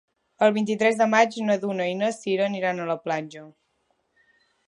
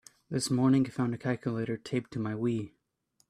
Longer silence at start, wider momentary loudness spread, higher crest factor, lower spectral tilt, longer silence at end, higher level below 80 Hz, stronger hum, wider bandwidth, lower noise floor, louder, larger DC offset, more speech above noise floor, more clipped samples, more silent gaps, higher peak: about the same, 0.4 s vs 0.3 s; about the same, 10 LU vs 10 LU; about the same, 20 dB vs 16 dB; about the same, -5 dB/octave vs -6 dB/octave; first, 1.15 s vs 0.6 s; second, -78 dBFS vs -66 dBFS; neither; second, 11 kHz vs 13.5 kHz; about the same, -71 dBFS vs -73 dBFS; first, -23 LUFS vs -31 LUFS; neither; first, 48 dB vs 43 dB; neither; neither; first, -6 dBFS vs -16 dBFS